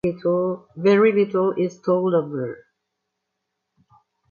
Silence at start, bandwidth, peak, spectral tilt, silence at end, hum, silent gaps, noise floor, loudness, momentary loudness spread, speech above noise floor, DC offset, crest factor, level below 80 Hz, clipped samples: 0.05 s; 7 kHz; -6 dBFS; -8 dB/octave; 1.75 s; none; none; -79 dBFS; -21 LUFS; 13 LU; 59 dB; under 0.1%; 18 dB; -62 dBFS; under 0.1%